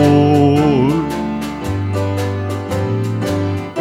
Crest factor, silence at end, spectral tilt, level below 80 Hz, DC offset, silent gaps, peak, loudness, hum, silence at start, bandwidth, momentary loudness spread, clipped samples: 14 dB; 0 s; -7.5 dB/octave; -40 dBFS; under 0.1%; none; -2 dBFS; -16 LUFS; none; 0 s; 16 kHz; 10 LU; under 0.1%